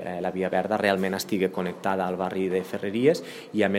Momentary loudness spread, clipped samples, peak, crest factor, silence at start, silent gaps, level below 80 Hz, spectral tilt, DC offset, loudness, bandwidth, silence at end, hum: 6 LU; under 0.1%; -6 dBFS; 20 dB; 0 s; none; -70 dBFS; -5.5 dB/octave; under 0.1%; -26 LUFS; 16 kHz; 0 s; none